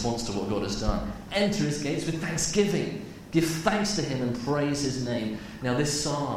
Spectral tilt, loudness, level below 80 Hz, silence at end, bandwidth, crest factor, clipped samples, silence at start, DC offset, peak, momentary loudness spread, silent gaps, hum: -4.5 dB/octave; -28 LUFS; -42 dBFS; 0 s; 16 kHz; 18 dB; under 0.1%; 0 s; under 0.1%; -8 dBFS; 6 LU; none; none